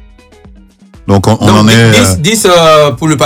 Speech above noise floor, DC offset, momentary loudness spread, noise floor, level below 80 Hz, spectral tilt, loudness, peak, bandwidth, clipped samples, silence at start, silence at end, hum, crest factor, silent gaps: 31 dB; under 0.1%; 6 LU; -37 dBFS; -34 dBFS; -4.5 dB/octave; -6 LUFS; 0 dBFS; 16.5 kHz; 2%; 1.05 s; 0 s; none; 8 dB; none